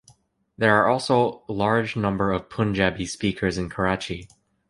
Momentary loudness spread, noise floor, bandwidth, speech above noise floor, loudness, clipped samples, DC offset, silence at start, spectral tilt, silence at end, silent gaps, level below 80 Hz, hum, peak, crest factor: 7 LU; -58 dBFS; 11.5 kHz; 35 dB; -23 LUFS; under 0.1%; under 0.1%; 0.6 s; -5.5 dB/octave; 0.45 s; none; -46 dBFS; none; -2 dBFS; 22 dB